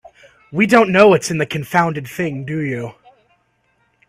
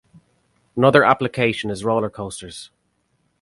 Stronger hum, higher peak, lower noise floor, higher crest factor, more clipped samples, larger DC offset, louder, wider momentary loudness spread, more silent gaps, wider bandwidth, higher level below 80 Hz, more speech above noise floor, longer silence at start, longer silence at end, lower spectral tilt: second, none vs 60 Hz at -45 dBFS; about the same, 0 dBFS vs 0 dBFS; second, -63 dBFS vs -68 dBFS; about the same, 18 dB vs 20 dB; neither; neither; about the same, -16 LUFS vs -18 LUFS; second, 14 LU vs 19 LU; neither; first, 16 kHz vs 11.5 kHz; about the same, -56 dBFS vs -54 dBFS; about the same, 47 dB vs 49 dB; second, 0.5 s vs 0.75 s; first, 1.2 s vs 0.75 s; about the same, -5.5 dB/octave vs -5.5 dB/octave